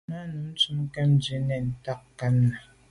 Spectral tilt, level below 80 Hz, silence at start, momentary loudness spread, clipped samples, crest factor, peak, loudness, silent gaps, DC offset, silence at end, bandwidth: -6.5 dB/octave; -54 dBFS; 0.1 s; 12 LU; under 0.1%; 14 dB; -12 dBFS; -27 LUFS; none; under 0.1%; 0.3 s; 11.5 kHz